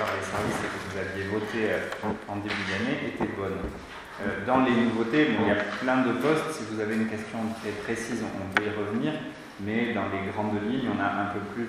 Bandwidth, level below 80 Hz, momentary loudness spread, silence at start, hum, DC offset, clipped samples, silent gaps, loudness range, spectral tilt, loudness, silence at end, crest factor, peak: 14.5 kHz; -54 dBFS; 9 LU; 0 s; none; under 0.1%; under 0.1%; none; 5 LU; -5.5 dB/octave; -28 LUFS; 0 s; 26 dB; -2 dBFS